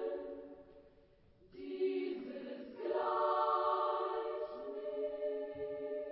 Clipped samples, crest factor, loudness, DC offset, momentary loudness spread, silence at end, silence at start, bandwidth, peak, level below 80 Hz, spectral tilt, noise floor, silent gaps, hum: under 0.1%; 16 dB; -38 LUFS; under 0.1%; 15 LU; 0 s; 0 s; 5.6 kHz; -22 dBFS; -76 dBFS; -2.5 dB/octave; -66 dBFS; none; none